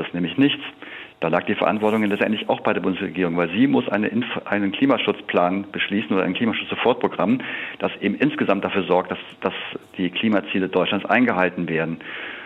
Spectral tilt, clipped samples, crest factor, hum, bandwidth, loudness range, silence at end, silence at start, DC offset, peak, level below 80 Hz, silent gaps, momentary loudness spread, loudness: -7.5 dB/octave; under 0.1%; 18 dB; none; 5 kHz; 1 LU; 0 s; 0 s; under 0.1%; -4 dBFS; -64 dBFS; none; 8 LU; -22 LUFS